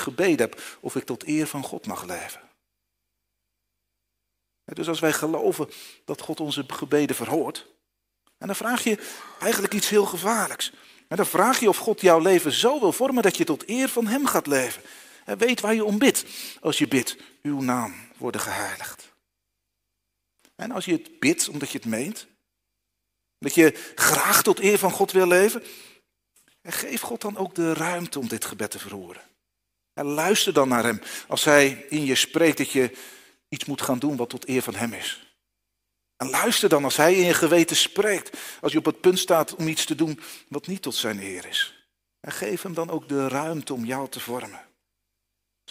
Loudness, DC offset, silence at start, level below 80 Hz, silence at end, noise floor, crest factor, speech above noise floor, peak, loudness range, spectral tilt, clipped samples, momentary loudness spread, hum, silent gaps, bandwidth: -23 LUFS; under 0.1%; 0 s; -68 dBFS; 1.1 s; -80 dBFS; 24 dB; 57 dB; -2 dBFS; 9 LU; -3 dB/octave; under 0.1%; 16 LU; 50 Hz at -60 dBFS; none; 16 kHz